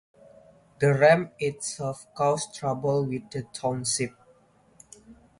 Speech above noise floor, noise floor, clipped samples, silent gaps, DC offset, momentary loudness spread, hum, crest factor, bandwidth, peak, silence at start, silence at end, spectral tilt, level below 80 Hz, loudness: 35 dB; -60 dBFS; under 0.1%; none; under 0.1%; 14 LU; none; 22 dB; 11.5 kHz; -6 dBFS; 0.8 s; 0.25 s; -4.5 dB/octave; -64 dBFS; -26 LUFS